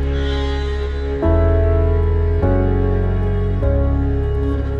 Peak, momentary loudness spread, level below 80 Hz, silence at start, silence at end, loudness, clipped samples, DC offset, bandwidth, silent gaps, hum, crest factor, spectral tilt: -2 dBFS; 5 LU; -20 dBFS; 0 s; 0 s; -18 LUFS; under 0.1%; under 0.1%; 6.2 kHz; none; none; 14 dB; -9 dB/octave